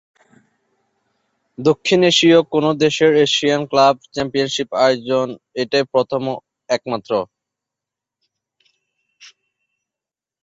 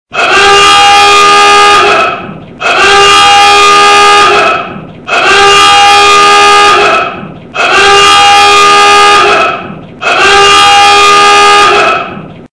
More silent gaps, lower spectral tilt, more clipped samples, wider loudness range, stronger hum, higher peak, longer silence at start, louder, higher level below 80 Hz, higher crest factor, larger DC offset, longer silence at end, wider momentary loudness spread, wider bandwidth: neither; first, -4.5 dB/octave vs -1 dB/octave; second, under 0.1% vs 10%; first, 13 LU vs 1 LU; neither; about the same, -2 dBFS vs 0 dBFS; first, 1.6 s vs 0.15 s; second, -17 LUFS vs -2 LUFS; second, -60 dBFS vs -36 dBFS; first, 18 dB vs 4 dB; neither; first, 3.2 s vs 0.1 s; about the same, 10 LU vs 11 LU; second, 8 kHz vs 11 kHz